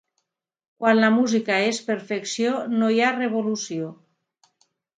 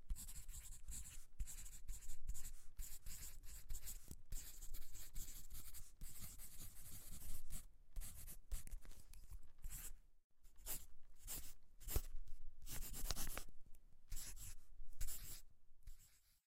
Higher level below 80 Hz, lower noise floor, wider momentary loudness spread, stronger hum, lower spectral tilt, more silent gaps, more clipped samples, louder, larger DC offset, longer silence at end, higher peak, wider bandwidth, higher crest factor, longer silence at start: second, -74 dBFS vs -52 dBFS; first, -77 dBFS vs -69 dBFS; second, 10 LU vs 13 LU; neither; first, -4 dB/octave vs -2.5 dB/octave; second, none vs 10.24-10.30 s; neither; first, -22 LUFS vs -55 LUFS; neither; first, 1.05 s vs 0.3 s; first, -4 dBFS vs -20 dBFS; second, 9.2 kHz vs 16 kHz; second, 20 dB vs 26 dB; first, 0.8 s vs 0 s